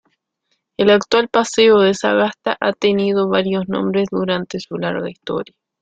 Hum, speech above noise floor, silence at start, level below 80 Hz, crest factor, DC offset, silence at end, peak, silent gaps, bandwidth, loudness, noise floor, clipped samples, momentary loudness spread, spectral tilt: none; 54 dB; 0.8 s; -58 dBFS; 16 dB; under 0.1%; 0.4 s; -2 dBFS; none; 9.2 kHz; -17 LUFS; -70 dBFS; under 0.1%; 13 LU; -5 dB/octave